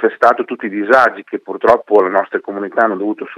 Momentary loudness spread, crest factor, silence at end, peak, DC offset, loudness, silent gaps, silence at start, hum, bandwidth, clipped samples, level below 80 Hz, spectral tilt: 10 LU; 14 dB; 0 s; 0 dBFS; under 0.1%; -14 LUFS; none; 0 s; none; 10.5 kHz; 0.2%; -58 dBFS; -6 dB/octave